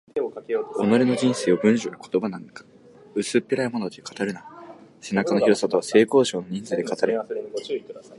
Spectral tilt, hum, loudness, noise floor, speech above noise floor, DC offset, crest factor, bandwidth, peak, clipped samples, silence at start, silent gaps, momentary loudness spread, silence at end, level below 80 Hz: -5 dB/octave; none; -23 LUFS; -44 dBFS; 21 dB; under 0.1%; 20 dB; 11.5 kHz; -4 dBFS; under 0.1%; 0.15 s; none; 13 LU; 0.05 s; -68 dBFS